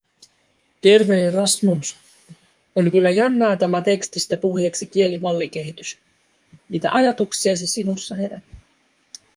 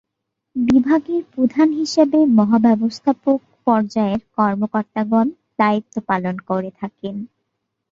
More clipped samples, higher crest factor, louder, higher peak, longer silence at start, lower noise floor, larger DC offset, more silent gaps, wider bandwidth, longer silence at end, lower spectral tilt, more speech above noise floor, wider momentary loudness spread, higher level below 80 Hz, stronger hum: neither; about the same, 18 dB vs 16 dB; about the same, -19 LUFS vs -18 LUFS; about the same, -2 dBFS vs -2 dBFS; first, 0.85 s vs 0.55 s; second, -63 dBFS vs -78 dBFS; neither; neither; first, 15 kHz vs 7.6 kHz; first, 0.8 s vs 0.65 s; second, -4.5 dB/octave vs -7 dB/octave; second, 44 dB vs 61 dB; about the same, 14 LU vs 14 LU; second, -60 dBFS vs -54 dBFS; neither